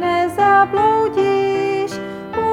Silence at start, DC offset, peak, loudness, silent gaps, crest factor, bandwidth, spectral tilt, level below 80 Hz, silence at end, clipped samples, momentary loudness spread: 0 s; under 0.1%; -2 dBFS; -16 LUFS; none; 14 dB; 13 kHz; -5.5 dB/octave; -52 dBFS; 0 s; under 0.1%; 11 LU